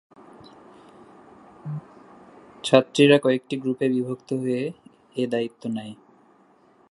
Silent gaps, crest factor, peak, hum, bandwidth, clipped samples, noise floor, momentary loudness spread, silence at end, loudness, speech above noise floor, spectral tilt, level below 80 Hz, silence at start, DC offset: none; 24 dB; 0 dBFS; none; 11.5 kHz; under 0.1%; -58 dBFS; 19 LU; 0.95 s; -23 LUFS; 36 dB; -6 dB/octave; -72 dBFS; 1.65 s; under 0.1%